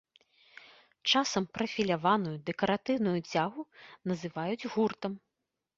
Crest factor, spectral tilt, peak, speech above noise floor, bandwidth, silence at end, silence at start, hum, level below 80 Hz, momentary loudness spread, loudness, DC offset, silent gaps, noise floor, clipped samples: 20 dB; -4.5 dB/octave; -14 dBFS; 55 dB; 7.8 kHz; 0.6 s; 1.05 s; none; -70 dBFS; 12 LU; -31 LUFS; under 0.1%; none; -86 dBFS; under 0.1%